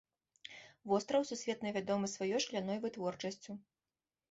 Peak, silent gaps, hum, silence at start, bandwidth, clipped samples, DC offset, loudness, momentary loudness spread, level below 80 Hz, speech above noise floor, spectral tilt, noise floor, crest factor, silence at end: -20 dBFS; none; none; 0.45 s; 8 kHz; under 0.1%; under 0.1%; -38 LUFS; 17 LU; -78 dBFS; over 53 dB; -4 dB/octave; under -90 dBFS; 20 dB; 0.7 s